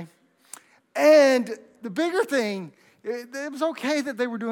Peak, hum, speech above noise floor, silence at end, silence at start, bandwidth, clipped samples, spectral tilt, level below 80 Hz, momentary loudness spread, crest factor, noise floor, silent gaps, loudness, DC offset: -6 dBFS; none; 29 dB; 0 s; 0 s; 17.5 kHz; under 0.1%; -4 dB/octave; -88 dBFS; 18 LU; 18 dB; -51 dBFS; none; -23 LUFS; under 0.1%